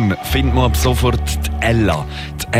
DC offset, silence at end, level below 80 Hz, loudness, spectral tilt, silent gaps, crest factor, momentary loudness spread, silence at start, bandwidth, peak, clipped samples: under 0.1%; 0 s; -22 dBFS; -17 LUFS; -5.5 dB/octave; none; 12 dB; 7 LU; 0 s; 16 kHz; -4 dBFS; under 0.1%